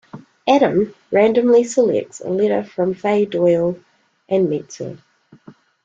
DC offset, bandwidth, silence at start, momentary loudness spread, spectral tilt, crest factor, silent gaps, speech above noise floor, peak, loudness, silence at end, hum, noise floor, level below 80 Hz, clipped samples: under 0.1%; 8 kHz; 0.15 s; 11 LU; -6 dB/octave; 16 dB; none; 29 dB; -2 dBFS; -17 LUFS; 0.35 s; none; -46 dBFS; -60 dBFS; under 0.1%